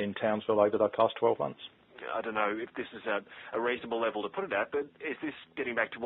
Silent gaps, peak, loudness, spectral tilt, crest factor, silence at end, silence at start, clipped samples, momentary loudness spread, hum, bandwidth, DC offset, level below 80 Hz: none; -12 dBFS; -32 LUFS; -3 dB/octave; 20 dB; 0 s; 0 s; under 0.1%; 11 LU; none; 4.2 kHz; under 0.1%; -72 dBFS